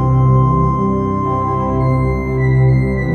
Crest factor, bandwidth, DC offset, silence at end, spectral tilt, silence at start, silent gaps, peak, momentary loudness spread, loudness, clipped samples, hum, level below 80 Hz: 12 dB; 4.4 kHz; under 0.1%; 0 s; -10.5 dB/octave; 0 s; none; -2 dBFS; 5 LU; -15 LUFS; under 0.1%; none; -26 dBFS